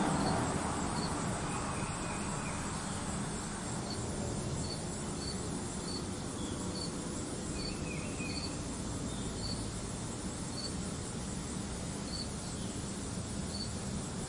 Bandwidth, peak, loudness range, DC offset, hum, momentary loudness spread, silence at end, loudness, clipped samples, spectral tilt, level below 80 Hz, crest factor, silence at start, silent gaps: 11.5 kHz; -20 dBFS; 2 LU; under 0.1%; none; 4 LU; 0 s; -38 LUFS; under 0.1%; -4 dB/octave; -50 dBFS; 18 dB; 0 s; none